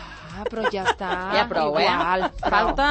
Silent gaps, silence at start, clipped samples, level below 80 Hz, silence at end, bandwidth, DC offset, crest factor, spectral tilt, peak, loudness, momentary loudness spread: none; 0 s; under 0.1%; -40 dBFS; 0 s; 8.8 kHz; under 0.1%; 18 dB; -4.5 dB/octave; -6 dBFS; -22 LUFS; 9 LU